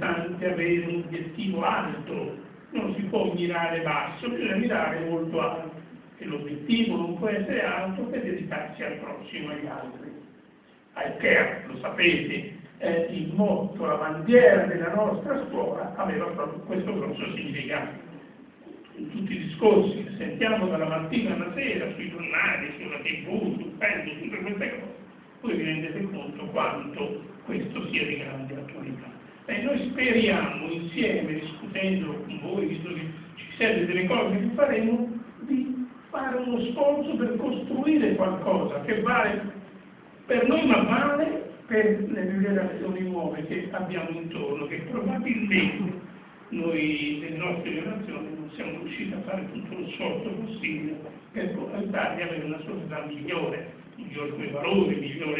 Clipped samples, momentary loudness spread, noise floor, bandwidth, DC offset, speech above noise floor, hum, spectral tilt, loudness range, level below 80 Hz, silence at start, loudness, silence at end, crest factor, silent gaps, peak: under 0.1%; 14 LU; -55 dBFS; 4 kHz; under 0.1%; 29 dB; none; -9.5 dB/octave; 8 LU; -60 dBFS; 0 s; -27 LUFS; 0 s; 24 dB; none; -4 dBFS